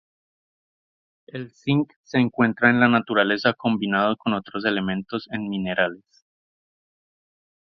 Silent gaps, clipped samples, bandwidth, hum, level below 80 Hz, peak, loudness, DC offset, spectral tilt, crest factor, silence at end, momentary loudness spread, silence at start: 1.96-2.04 s; under 0.1%; 6.4 kHz; none; -62 dBFS; 0 dBFS; -22 LUFS; under 0.1%; -7.5 dB/octave; 24 dB; 1.8 s; 11 LU; 1.35 s